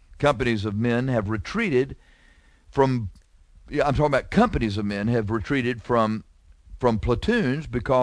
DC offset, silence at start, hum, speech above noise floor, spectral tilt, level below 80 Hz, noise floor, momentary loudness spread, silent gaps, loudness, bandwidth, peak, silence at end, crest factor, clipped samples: under 0.1%; 0.1 s; none; 32 dB; -7 dB/octave; -40 dBFS; -55 dBFS; 7 LU; none; -24 LUFS; 10.5 kHz; -6 dBFS; 0 s; 18 dB; under 0.1%